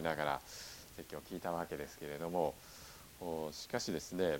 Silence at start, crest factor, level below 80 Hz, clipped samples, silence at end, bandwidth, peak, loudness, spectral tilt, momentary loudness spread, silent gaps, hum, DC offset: 0 s; 22 dB; -64 dBFS; under 0.1%; 0 s; 17.5 kHz; -20 dBFS; -42 LUFS; -4.5 dB/octave; 14 LU; none; none; under 0.1%